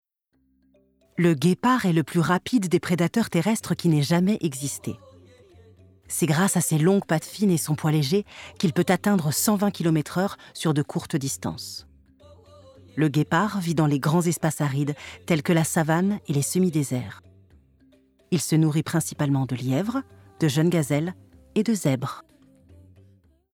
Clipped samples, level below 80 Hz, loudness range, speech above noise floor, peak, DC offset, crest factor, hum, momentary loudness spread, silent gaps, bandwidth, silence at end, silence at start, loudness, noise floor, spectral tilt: under 0.1%; -62 dBFS; 4 LU; 46 dB; -6 dBFS; under 0.1%; 18 dB; none; 9 LU; none; 18 kHz; 1.3 s; 1.15 s; -24 LUFS; -69 dBFS; -5.5 dB/octave